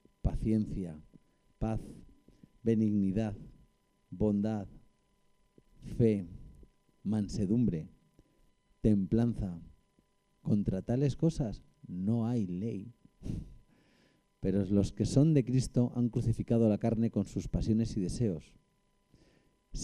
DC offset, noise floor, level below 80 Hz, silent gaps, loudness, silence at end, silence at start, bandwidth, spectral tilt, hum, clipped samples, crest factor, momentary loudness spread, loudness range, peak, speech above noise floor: under 0.1%; -73 dBFS; -48 dBFS; none; -32 LUFS; 0 s; 0.25 s; 11 kHz; -8.5 dB/octave; none; under 0.1%; 18 dB; 16 LU; 6 LU; -14 dBFS; 42 dB